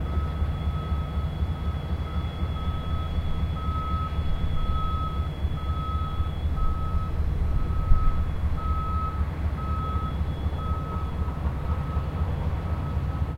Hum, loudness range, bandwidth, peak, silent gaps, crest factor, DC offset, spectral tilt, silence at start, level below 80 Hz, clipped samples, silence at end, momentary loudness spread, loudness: none; 1 LU; 5.6 kHz; -6 dBFS; none; 18 dB; under 0.1%; -8 dB/octave; 0 s; -28 dBFS; under 0.1%; 0 s; 2 LU; -29 LUFS